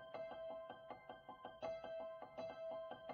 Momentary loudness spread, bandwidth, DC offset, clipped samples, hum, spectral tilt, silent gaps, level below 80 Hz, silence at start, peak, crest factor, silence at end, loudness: 7 LU; 6.4 kHz; under 0.1%; under 0.1%; none; -3 dB/octave; none; -80 dBFS; 0 s; -36 dBFS; 16 dB; 0 s; -52 LUFS